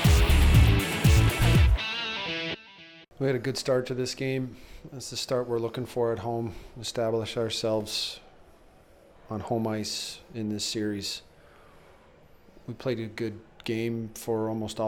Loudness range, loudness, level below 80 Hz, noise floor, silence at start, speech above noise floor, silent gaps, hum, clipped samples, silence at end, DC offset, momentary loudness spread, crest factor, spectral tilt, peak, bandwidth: 10 LU; -28 LUFS; -32 dBFS; -55 dBFS; 0 s; 25 dB; none; none; under 0.1%; 0 s; under 0.1%; 17 LU; 18 dB; -5.5 dB/octave; -10 dBFS; over 20 kHz